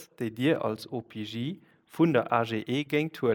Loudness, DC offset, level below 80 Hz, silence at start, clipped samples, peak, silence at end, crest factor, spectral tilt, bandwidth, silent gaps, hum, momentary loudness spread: -29 LUFS; under 0.1%; -74 dBFS; 0 s; under 0.1%; -8 dBFS; 0 s; 20 dB; -7 dB/octave; 19 kHz; none; none; 12 LU